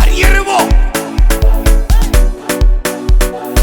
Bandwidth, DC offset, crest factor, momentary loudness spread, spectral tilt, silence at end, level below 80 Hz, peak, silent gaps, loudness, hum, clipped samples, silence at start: 18.5 kHz; under 0.1%; 8 dB; 5 LU; -4.5 dB/octave; 0 s; -10 dBFS; 0 dBFS; none; -13 LUFS; none; under 0.1%; 0 s